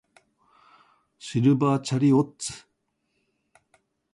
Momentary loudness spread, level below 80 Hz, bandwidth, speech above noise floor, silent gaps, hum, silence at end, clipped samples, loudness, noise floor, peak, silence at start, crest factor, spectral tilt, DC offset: 17 LU; -66 dBFS; 11.5 kHz; 53 dB; none; none; 1.55 s; under 0.1%; -23 LUFS; -75 dBFS; -10 dBFS; 1.25 s; 18 dB; -6.5 dB/octave; under 0.1%